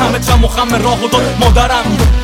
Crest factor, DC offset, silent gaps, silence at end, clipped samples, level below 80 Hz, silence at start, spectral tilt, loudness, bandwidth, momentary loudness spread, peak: 10 dB; under 0.1%; none; 0 s; under 0.1%; -14 dBFS; 0 s; -5 dB/octave; -11 LUFS; 17 kHz; 2 LU; 0 dBFS